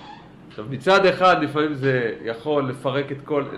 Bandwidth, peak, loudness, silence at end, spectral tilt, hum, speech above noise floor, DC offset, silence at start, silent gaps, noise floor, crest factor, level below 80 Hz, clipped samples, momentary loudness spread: 12 kHz; -6 dBFS; -21 LUFS; 0 s; -6 dB/octave; none; 22 dB; under 0.1%; 0 s; none; -43 dBFS; 16 dB; -58 dBFS; under 0.1%; 13 LU